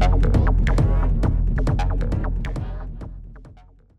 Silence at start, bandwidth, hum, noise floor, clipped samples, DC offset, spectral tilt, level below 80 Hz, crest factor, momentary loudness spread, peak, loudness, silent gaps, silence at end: 0 s; 8 kHz; none; -48 dBFS; under 0.1%; under 0.1%; -8 dB/octave; -22 dBFS; 12 dB; 16 LU; -8 dBFS; -22 LUFS; none; 0.5 s